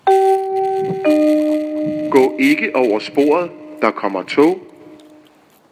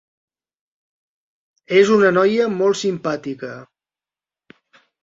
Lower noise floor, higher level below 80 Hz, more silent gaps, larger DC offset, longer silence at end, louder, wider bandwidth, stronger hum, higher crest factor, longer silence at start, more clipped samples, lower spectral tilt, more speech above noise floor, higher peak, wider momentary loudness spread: second, -50 dBFS vs under -90 dBFS; about the same, -66 dBFS vs -64 dBFS; neither; neither; second, 0.75 s vs 1.4 s; about the same, -16 LUFS vs -17 LUFS; first, 16 kHz vs 7.8 kHz; neither; about the same, 16 dB vs 18 dB; second, 0.05 s vs 1.7 s; neither; about the same, -5.5 dB/octave vs -5 dB/octave; second, 35 dB vs over 73 dB; about the same, 0 dBFS vs -2 dBFS; second, 7 LU vs 17 LU